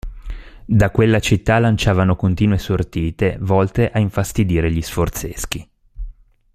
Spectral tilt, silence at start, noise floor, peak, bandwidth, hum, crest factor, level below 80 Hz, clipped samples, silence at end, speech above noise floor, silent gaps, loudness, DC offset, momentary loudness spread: -6.5 dB/octave; 0.05 s; -37 dBFS; 0 dBFS; 15.5 kHz; none; 16 dB; -32 dBFS; under 0.1%; 0.45 s; 21 dB; none; -18 LUFS; under 0.1%; 21 LU